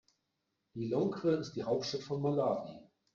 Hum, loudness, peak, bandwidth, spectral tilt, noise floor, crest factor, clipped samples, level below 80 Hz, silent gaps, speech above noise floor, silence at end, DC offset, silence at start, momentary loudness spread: none; -35 LUFS; -20 dBFS; 7.6 kHz; -6.5 dB/octave; -84 dBFS; 16 dB; under 0.1%; -72 dBFS; none; 50 dB; 0.35 s; under 0.1%; 0.75 s; 10 LU